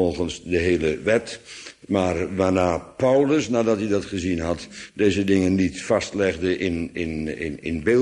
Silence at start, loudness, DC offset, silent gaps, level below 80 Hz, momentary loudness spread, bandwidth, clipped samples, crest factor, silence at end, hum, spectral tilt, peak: 0 s; -23 LUFS; under 0.1%; none; -46 dBFS; 9 LU; 11 kHz; under 0.1%; 16 dB; 0 s; none; -6 dB/octave; -6 dBFS